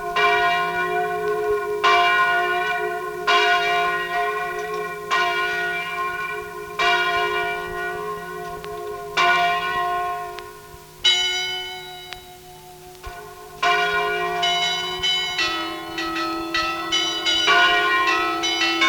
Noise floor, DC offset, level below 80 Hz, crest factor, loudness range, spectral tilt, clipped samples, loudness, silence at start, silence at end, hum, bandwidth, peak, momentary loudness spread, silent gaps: -42 dBFS; under 0.1%; -52 dBFS; 16 dB; 5 LU; -1.5 dB/octave; under 0.1%; -20 LUFS; 0 s; 0 s; none; 19 kHz; -6 dBFS; 15 LU; none